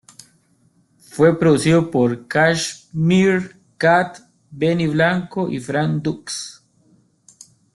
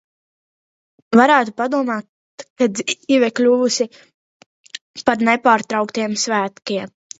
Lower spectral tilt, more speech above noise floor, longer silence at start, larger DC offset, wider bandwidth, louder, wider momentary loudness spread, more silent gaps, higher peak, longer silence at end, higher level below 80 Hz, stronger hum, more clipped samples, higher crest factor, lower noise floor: first, -5.5 dB/octave vs -3.5 dB/octave; second, 42 dB vs over 73 dB; about the same, 1.15 s vs 1.1 s; neither; first, 12 kHz vs 8 kHz; about the same, -18 LUFS vs -17 LUFS; about the same, 13 LU vs 12 LU; second, none vs 2.09-2.38 s, 2.50-2.56 s, 4.14-4.40 s, 4.46-4.64 s, 4.81-4.94 s; second, -4 dBFS vs 0 dBFS; first, 1.25 s vs 0.3 s; first, -56 dBFS vs -66 dBFS; neither; neither; about the same, 16 dB vs 18 dB; second, -59 dBFS vs under -90 dBFS